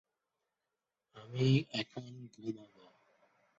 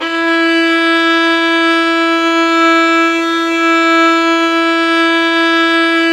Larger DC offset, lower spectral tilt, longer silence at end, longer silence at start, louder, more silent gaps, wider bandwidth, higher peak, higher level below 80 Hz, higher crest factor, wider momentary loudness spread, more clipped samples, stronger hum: neither; first, -6 dB/octave vs -1.5 dB/octave; first, 0.95 s vs 0 s; first, 1.15 s vs 0 s; second, -36 LUFS vs -10 LUFS; neither; second, 7.6 kHz vs 10.5 kHz; second, -18 dBFS vs 0 dBFS; second, -74 dBFS vs -56 dBFS; first, 20 dB vs 10 dB; first, 19 LU vs 3 LU; neither; neither